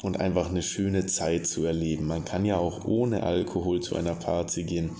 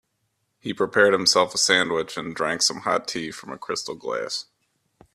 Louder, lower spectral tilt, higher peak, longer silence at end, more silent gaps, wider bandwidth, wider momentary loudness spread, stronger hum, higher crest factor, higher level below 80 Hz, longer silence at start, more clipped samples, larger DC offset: second, -28 LUFS vs -22 LUFS; first, -5.5 dB/octave vs -2 dB/octave; second, -10 dBFS vs -2 dBFS; second, 0 s vs 0.7 s; neither; second, 8 kHz vs 15 kHz; second, 3 LU vs 13 LU; neither; about the same, 18 dB vs 22 dB; first, -44 dBFS vs -66 dBFS; second, 0 s vs 0.65 s; neither; neither